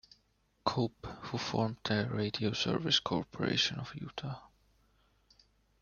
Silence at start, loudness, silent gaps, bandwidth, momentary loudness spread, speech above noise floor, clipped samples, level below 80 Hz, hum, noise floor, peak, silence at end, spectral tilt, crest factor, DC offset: 0.65 s; -34 LUFS; none; 7.2 kHz; 13 LU; 39 dB; under 0.1%; -64 dBFS; none; -73 dBFS; -14 dBFS; 1.35 s; -4.5 dB/octave; 22 dB; under 0.1%